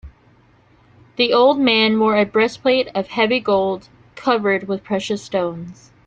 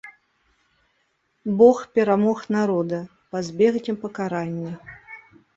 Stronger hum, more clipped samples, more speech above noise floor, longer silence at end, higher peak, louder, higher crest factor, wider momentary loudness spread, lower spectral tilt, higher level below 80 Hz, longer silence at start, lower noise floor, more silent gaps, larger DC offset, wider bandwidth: neither; neither; second, 35 dB vs 48 dB; about the same, 0.35 s vs 0.4 s; about the same, -2 dBFS vs -2 dBFS; first, -18 LUFS vs -22 LUFS; about the same, 16 dB vs 20 dB; second, 11 LU vs 23 LU; second, -5 dB/octave vs -7 dB/octave; first, -54 dBFS vs -64 dBFS; about the same, 0.05 s vs 0.05 s; second, -53 dBFS vs -69 dBFS; neither; neither; first, 9 kHz vs 7.8 kHz